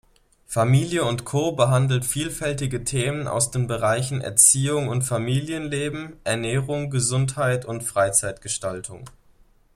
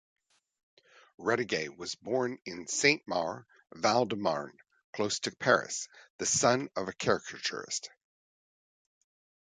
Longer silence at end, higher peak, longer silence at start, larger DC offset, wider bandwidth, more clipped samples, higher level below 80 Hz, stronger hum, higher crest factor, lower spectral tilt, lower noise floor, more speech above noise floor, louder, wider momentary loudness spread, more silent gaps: second, 0.65 s vs 1.6 s; first, -2 dBFS vs -10 dBFS; second, 0.5 s vs 1.2 s; neither; first, 15.5 kHz vs 9.6 kHz; neither; first, -50 dBFS vs -70 dBFS; neither; about the same, 22 dB vs 24 dB; first, -4 dB/octave vs -2.5 dB/octave; second, -56 dBFS vs under -90 dBFS; second, 33 dB vs over 59 dB; first, -22 LUFS vs -31 LUFS; second, 8 LU vs 12 LU; second, none vs 4.84-4.93 s, 6.10-6.19 s